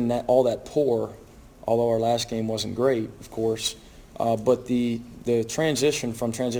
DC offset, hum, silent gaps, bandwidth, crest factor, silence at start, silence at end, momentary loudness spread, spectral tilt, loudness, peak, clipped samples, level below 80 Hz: under 0.1%; none; none; over 20 kHz; 18 dB; 0 s; 0 s; 7 LU; -5 dB/octave; -25 LUFS; -8 dBFS; under 0.1%; -52 dBFS